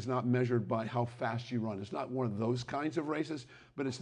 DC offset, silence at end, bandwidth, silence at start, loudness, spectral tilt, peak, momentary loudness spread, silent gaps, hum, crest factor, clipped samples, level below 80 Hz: under 0.1%; 0 s; 10 kHz; 0 s; -35 LUFS; -7 dB/octave; -20 dBFS; 8 LU; none; none; 16 dB; under 0.1%; -68 dBFS